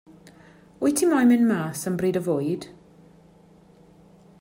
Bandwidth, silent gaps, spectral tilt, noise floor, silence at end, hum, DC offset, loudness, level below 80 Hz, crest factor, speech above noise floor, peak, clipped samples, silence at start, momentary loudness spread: 16 kHz; none; -5.5 dB/octave; -53 dBFS; 1.75 s; none; under 0.1%; -23 LUFS; -64 dBFS; 16 dB; 32 dB; -10 dBFS; under 0.1%; 0.8 s; 11 LU